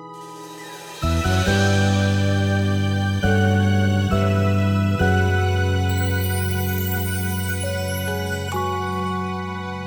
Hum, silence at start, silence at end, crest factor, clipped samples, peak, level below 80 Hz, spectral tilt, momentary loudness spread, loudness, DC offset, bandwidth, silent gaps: none; 0 s; 0 s; 14 dB; under 0.1%; -6 dBFS; -38 dBFS; -6 dB/octave; 9 LU; -21 LUFS; under 0.1%; over 20 kHz; none